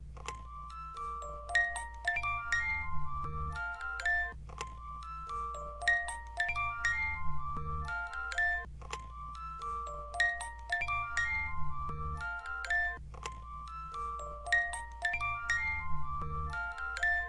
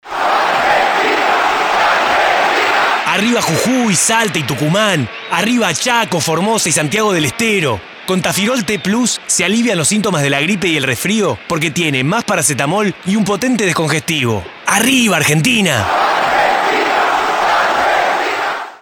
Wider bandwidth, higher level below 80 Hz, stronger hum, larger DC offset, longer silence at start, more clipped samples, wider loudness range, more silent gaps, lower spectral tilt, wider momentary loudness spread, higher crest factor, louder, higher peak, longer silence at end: second, 11.5 kHz vs 20 kHz; about the same, -48 dBFS vs -50 dBFS; neither; neither; about the same, 0 s vs 0.05 s; neither; about the same, 2 LU vs 2 LU; neither; about the same, -3 dB/octave vs -3.5 dB/octave; first, 13 LU vs 5 LU; first, 20 dB vs 14 dB; second, -35 LUFS vs -13 LUFS; second, -16 dBFS vs 0 dBFS; about the same, 0 s vs 0.05 s